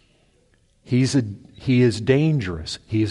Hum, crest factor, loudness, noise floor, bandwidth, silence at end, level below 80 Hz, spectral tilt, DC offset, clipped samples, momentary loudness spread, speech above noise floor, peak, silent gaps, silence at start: none; 16 dB; -21 LUFS; -60 dBFS; 11.5 kHz; 0 s; -48 dBFS; -6.5 dB/octave; under 0.1%; under 0.1%; 12 LU; 40 dB; -6 dBFS; none; 0.9 s